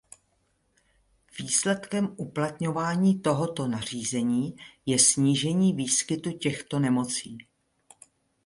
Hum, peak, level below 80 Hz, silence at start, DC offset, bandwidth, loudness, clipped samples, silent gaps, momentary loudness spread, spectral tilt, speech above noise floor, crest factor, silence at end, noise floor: none; -6 dBFS; -64 dBFS; 1.35 s; under 0.1%; 11.5 kHz; -26 LUFS; under 0.1%; none; 11 LU; -4 dB/octave; 45 dB; 20 dB; 1.05 s; -71 dBFS